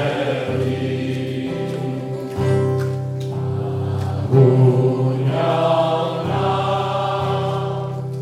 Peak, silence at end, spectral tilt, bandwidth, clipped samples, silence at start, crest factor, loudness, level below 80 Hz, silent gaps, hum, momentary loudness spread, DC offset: -2 dBFS; 0 s; -8 dB/octave; 9.6 kHz; under 0.1%; 0 s; 16 dB; -20 LUFS; -54 dBFS; none; none; 10 LU; under 0.1%